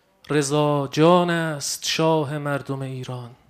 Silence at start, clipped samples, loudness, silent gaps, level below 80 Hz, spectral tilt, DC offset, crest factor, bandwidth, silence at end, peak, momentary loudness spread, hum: 0.3 s; under 0.1%; -21 LUFS; none; -64 dBFS; -5 dB/octave; under 0.1%; 18 dB; 15.5 kHz; 0.15 s; -4 dBFS; 13 LU; none